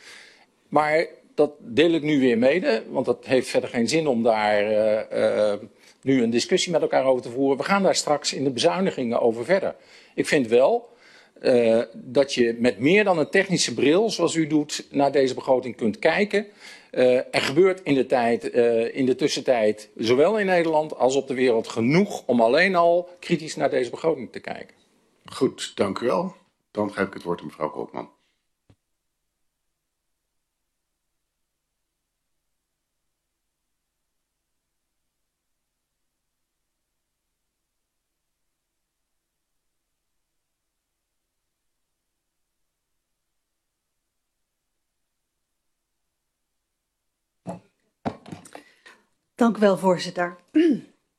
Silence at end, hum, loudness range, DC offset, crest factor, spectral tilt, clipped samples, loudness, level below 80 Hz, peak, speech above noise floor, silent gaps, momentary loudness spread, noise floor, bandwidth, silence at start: 0.35 s; none; 10 LU; under 0.1%; 22 dB; -4.5 dB/octave; under 0.1%; -22 LUFS; -68 dBFS; -4 dBFS; 58 dB; none; 12 LU; -79 dBFS; 13 kHz; 0.05 s